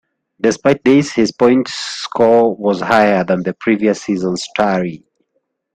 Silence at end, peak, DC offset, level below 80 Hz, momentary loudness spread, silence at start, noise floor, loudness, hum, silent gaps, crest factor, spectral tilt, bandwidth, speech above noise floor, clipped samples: 0.8 s; 0 dBFS; under 0.1%; -54 dBFS; 8 LU; 0.45 s; -68 dBFS; -15 LUFS; none; none; 14 dB; -5.5 dB/octave; 9.4 kHz; 54 dB; under 0.1%